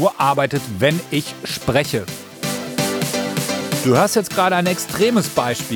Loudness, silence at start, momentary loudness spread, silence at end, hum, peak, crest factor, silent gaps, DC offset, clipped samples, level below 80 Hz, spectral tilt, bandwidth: -19 LUFS; 0 s; 8 LU; 0 s; none; -2 dBFS; 18 dB; none; under 0.1%; under 0.1%; -54 dBFS; -4.5 dB/octave; over 20 kHz